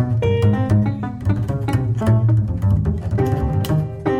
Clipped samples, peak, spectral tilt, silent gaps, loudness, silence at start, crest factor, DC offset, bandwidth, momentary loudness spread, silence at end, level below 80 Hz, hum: under 0.1%; -6 dBFS; -8.5 dB/octave; none; -19 LUFS; 0 s; 12 dB; under 0.1%; 14 kHz; 5 LU; 0 s; -32 dBFS; none